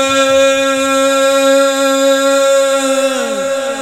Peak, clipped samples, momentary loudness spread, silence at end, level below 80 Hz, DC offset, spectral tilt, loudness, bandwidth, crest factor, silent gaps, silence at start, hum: 0 dBFS; under 0.1%; 6 LU; 0 s; -56 dBFS; 0.2%; -1.5 dB/octave; -11 LUFS; 16 kHz; 10 dB; none; 0 s; none